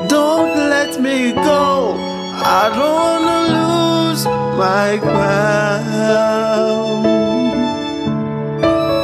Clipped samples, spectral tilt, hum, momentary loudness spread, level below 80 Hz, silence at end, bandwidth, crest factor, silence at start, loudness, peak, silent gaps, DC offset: under 0.1%; -5 dB/octave; none; 6 LU; -46 dBFS; 0 s; 15 kHz; 14 dB; 0 s; -15 LUFS; 0 dBFS; none; under 0.1%